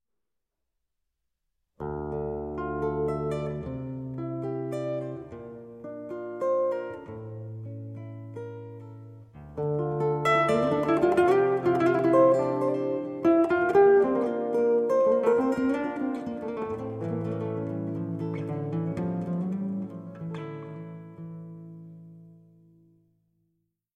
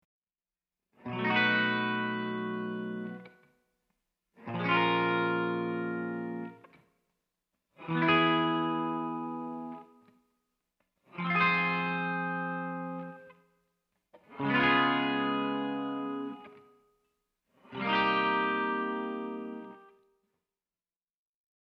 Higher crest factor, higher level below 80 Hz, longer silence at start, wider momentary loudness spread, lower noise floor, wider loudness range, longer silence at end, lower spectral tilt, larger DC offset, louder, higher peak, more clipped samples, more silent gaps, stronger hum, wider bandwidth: about the same, 18 dB vs 20 dB; first, -56 dBFS vs -72 dBFS; first, 1.8 s vs 1.05 s; about the same, 20 LU vs 18 LU; second, -85 dBFS vs under -90 dBFS; first, 13 LU vs 3 LU; second, 1.6 s vs 1.85 s; about the same, -8 dB/octave vs -7.5 dB/octave; neither; first, -27 LUFS vs -30 LUFS; first, -10 dBFS vs -14 dBFS; neither; neither; neither; first, 10 kHz vs 6.2 kHz